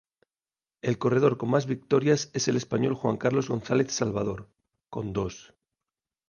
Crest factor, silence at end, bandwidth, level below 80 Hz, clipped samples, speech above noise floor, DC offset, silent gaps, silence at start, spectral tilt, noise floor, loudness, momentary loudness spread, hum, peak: 18 dB; 0.9 s; 10 kHz; -58 dBFS; under 0.1%; over 64 dB; under 0.1%; none; 0.85 s; -5.5 dB/octave; under -90 dBFS; -27 LUFS; 11 LU; none; -10 dBFS